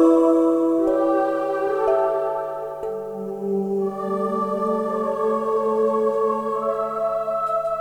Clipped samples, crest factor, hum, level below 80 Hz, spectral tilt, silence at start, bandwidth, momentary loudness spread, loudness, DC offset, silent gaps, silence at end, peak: under 0.1%; 16 dB; 50 Hz at -55 dBFS; -60 dBFS; -8 dB/octave; 0 s; 11 kHz; 9 LU; -22 LUFS; under 0.1%; none; 0 s; -6 dBFS